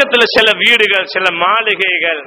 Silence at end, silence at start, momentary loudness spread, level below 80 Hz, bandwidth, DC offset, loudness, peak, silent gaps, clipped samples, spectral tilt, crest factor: 0 s; 0 s; 4 LU; -52 dBFS; over 20 kHz; under 0.1%; -10 LUFS; 0 dBFS; none; 0.6%; -2.5 dB/octave; 12 dB